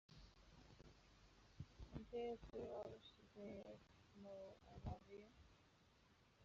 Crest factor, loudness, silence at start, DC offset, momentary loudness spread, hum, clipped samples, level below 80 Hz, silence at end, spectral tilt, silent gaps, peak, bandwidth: 20 dB; -57 LUFS; 0.1 s; under 0.1%; 17 LU; none; under 0.1%; -70 dBFS; 0 s; -6 dB/octave; none; -38 dBFS; 7.4 kHz